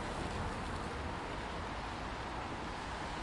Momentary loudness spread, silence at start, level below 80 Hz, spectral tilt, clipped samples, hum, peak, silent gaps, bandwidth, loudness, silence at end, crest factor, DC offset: 2 LU; 0 s; -48 dBFS; -5 dB/octave; under 0.1%; none; -26 dBFS; none; 11.5 kHz; -41 LUFS; 0 s; 16 dB; under 0.1%